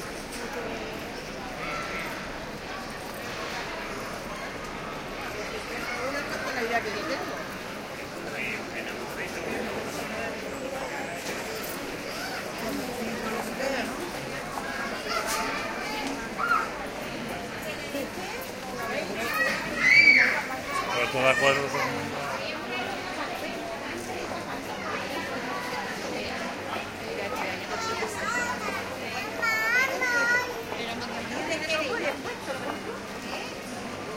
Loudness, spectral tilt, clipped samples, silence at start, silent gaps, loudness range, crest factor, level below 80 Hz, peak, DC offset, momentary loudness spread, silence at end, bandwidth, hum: -29 LUFS; -3 dB/octave; under 0.1%; 0 s; none; 12 LU; 22 dB; -54 dBFS; -8 dBFS; under 0.1%; 12 LU; 0 s; 16.5 kHz; none